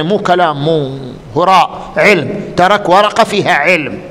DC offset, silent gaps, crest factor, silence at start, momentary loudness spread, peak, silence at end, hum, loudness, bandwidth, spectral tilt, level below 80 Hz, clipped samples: under 0.1%; none; 12 dB; 0 s; 8 LU; 0 dBFS; 0 s; none; -11 LUFS; 16.5 kHz; -5 dB/octave; -44 dBFS; 0.2%